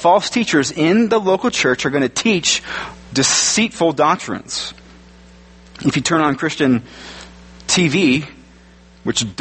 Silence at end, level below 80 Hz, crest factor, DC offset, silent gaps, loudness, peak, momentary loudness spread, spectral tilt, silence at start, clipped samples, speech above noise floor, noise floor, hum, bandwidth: 0.1 s; -48 dBFS; 16 dB; under 0.1%; none; -16 LUFS; 0 dBFS; 14 LU; -3.5 dB/octave; 0 s; under 0.1%; 29 dB; -45 dBFS; none; 8.8 kHz